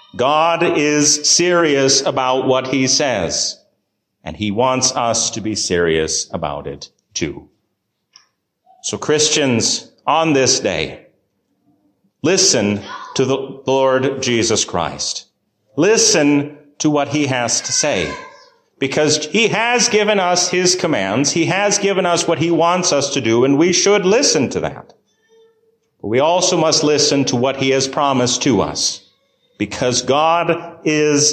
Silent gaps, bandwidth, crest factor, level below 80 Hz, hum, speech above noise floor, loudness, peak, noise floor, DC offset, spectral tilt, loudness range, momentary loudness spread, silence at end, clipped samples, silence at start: none; 14.5 kHz; 16 dB; -48 dBFS; none; 56 dB; -15 LUFS; -2 dBFS; -71 dBFS; under 0.1%; -3 dB/octave; 4 LU; 11 LU; 0 s; under 0.1%; 0.15 s